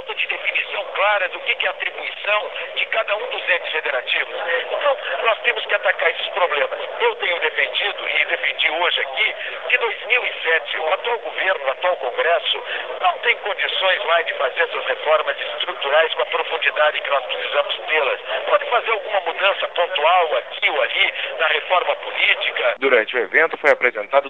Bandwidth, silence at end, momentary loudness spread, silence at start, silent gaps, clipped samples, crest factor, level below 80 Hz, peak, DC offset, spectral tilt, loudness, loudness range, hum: 7.4 kHz; 0 s; 5 LU; 0 s; none; under 0.1%; 20 dB; -76 dBFS; 0 dBFS; 0.3%; -2 dB/octave; -19 LUFS; 3 LU; none